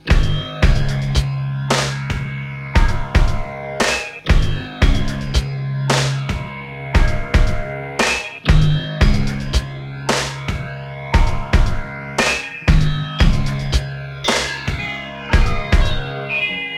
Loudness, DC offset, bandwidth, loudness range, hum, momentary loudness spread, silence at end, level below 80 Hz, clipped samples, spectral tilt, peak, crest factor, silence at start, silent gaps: -19 LUFS; under 0.1%; 13 kHz; 2 LU; none; 8 LU; 0 s; -20 dBFS; under 0.1%; -5 dB/octave; 0 dBFS; 16 dB; 0.05 s; none